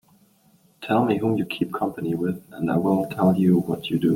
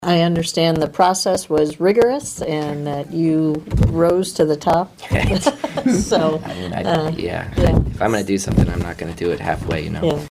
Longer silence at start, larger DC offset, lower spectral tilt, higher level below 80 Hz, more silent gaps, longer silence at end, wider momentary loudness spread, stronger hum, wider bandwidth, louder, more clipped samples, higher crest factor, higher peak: first, 0.8 s vs 0 s; neither; first, -8 dB/octave vs -5.5 dB/octave; second, -60 dBFS vs -30 dBFS; neither; about the same, 0 s vs 0 s; about the same, 7 LU vs 7 LU; neither; about the same, 16.5 kHz vs 16 kHz; second, -23 LUFS vs -19 LUFS; neither; about the same, 16 dB vs 18 dB; second, -6 dBFS vs 0 dBFS